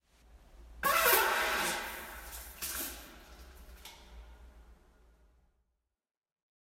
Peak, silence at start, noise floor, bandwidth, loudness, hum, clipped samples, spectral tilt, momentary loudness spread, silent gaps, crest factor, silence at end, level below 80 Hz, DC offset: -12 dBFS; 0.35 s; -83 dBFS; 16 kHz; -31 LUFS; none; under 0.1%; -1 dB/octave; 28 LU; none; 26 dB; 1.95 s; -56 dBFS; under 0.1%